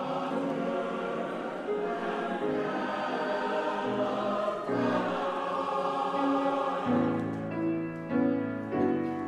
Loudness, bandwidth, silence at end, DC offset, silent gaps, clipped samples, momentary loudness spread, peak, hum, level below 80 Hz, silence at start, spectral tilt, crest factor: -31 LUFS; 10.5 kHz; 0 s; under 0.1%; none; under 0.1%; 5 LU; -16 dBFS; none; -70 dBFS; 0 s; -7 dB/octave; 14 dB